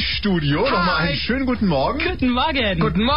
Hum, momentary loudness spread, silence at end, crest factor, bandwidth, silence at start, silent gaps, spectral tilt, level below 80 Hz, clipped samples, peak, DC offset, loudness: none; 3 LU; 0 s; 12 dB; 5.6 kHz; 0 s; none; -8.5 dB/octave; -34 dBFS; under 0.1%; -6 dBFS; 2%; -19 LUFS